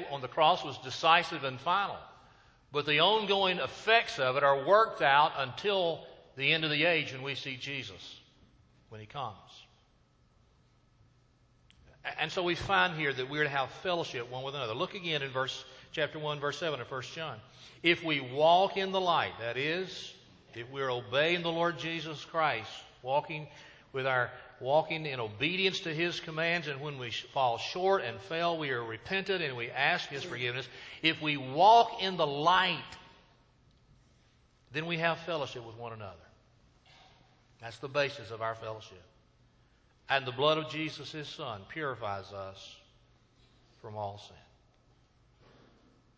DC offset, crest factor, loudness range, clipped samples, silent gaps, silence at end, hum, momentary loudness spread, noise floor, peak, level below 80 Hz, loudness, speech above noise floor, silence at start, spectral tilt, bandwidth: under 0.1%; 24 dB; 14 LU; under 0.1%; none; 1.8 s; none; 18 LU; -67 dBFS; -8 dBFS; -66 dBFS; -31 LUFS; 35 dB; 0 s; -4.5 dB/octave; 8 kHz